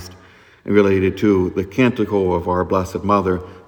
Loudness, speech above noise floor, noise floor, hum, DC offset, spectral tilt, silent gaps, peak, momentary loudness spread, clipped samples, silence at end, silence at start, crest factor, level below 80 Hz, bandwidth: -18 LUFS; 30 dB; -47 dBFS; none; under 0.1%; -7.5 dB/octave; none; 0 dBFS; 5 LU; under 0.1%; 0.1 s; 0 s; 18 dB; -50 dBFS; 19.5 kHz